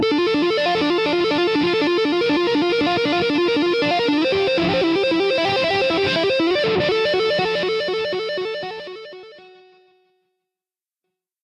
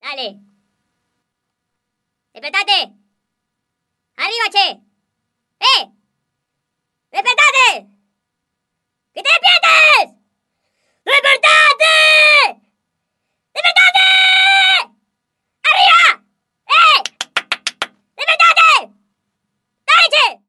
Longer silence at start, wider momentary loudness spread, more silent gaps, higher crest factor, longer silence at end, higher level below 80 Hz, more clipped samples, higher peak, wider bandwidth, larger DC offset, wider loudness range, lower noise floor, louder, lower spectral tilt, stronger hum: about the same, 0 s vs 0.05 s; second, 6 LU vs 18 LU; neither; about the same, 10 dB vs 14 dB; first, 2.05 s vs 0.15 s; first, -54 dBFS vs -70 dBFS; neither; second, -8 dBFS vs 0 dBFS; about the same, 11.5 kHz vs 12 kHz; neither; about the same, 9 LU vs 10 LU; first, under -90 dBFS vs -76 dBFS; second, -19 LUFS vs -10 LUFS; first, -5 dB/octave vs 2.5 dB/octave; neither